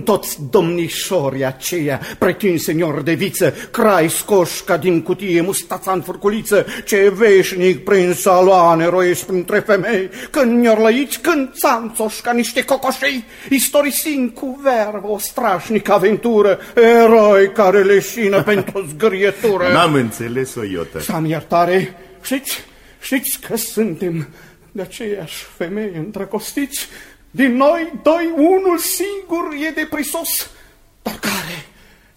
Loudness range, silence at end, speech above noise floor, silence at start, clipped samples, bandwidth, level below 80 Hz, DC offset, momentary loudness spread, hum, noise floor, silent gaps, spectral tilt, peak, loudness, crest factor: 10 LU; 0.55 s; 31 dB; 0 s; under 0.1%; 16.5 kHz; -50 dBFS; under 0.1%; 12 LU; none; -47 dBFS; none; -4.5 dB/octave; -2 dBFS; -16 LUFS; 14 dB